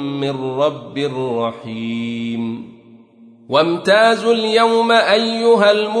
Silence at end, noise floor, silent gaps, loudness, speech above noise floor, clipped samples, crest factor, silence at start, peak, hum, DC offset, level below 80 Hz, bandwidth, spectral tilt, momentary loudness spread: 0 s; -45 dBFS; none; -16 LUFS; 29 dB; under 0.1%; 16 dB; 0 s; -2 dBFS; none; under 0.1%; -66 dBFS; 10.5 kHz; -5 dB/octave; 11 LU